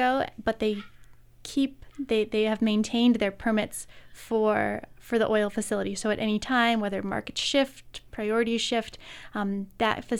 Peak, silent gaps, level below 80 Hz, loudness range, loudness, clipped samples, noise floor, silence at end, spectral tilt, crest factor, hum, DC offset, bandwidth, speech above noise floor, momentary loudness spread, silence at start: -8 dBFS; none; -54 dBFS; 1 LU; -27 LUFS; under 0.1%; -50 dBFS; 0 s; -4.5 dB/octave; 18 dB; none; under 0.1%; 15 kHz; 24 dB; 13 LU; 0 s